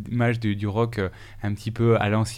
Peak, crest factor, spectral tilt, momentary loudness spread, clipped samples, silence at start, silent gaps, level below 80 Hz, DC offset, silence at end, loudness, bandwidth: -8 dBFS; 16 dB; -7 dB/octave; 10 LU; under 0.1%; 0 s; none; -48 dBFS; under 0.1%; 0 s; -25 LUFS; 13 kHz